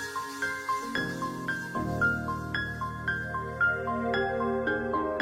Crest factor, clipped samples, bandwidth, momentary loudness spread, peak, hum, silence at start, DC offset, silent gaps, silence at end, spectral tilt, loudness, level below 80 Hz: 14 dB; under 0.1%; 16 kHz; 6 LU; -16 dBFS; none; 0 s; under 0.1%; none; 0 s; -5.5 dB/octave; -30 LUFS; -50 dBFS